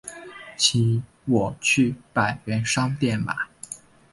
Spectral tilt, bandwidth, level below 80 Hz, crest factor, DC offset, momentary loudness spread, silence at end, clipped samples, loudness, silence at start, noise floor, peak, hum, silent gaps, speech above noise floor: -4 dB/octave; 11.5 kHz; -54 dBFS; 20 dB; under 0.1%; 18 LU; 0.35 s; under 0.1%; -23 LUFS; 0.05 s; -42 dBFS; -4 dBFS; none; none; 19 dB